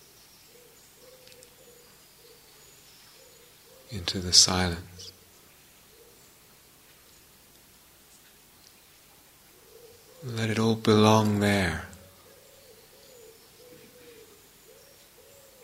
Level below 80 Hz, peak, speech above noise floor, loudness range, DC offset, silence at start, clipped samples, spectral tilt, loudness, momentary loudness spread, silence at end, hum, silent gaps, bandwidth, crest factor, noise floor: -56 dBFS; -2 dBFS; 33 dB; 13 LU; under 0.1%; 3.9 s; under 0.1%; -3.5 dB/octave; -23 LUFS; 32 LU; 3.7 s; none; none; 16 kHz; 28 dB; -56 dBFS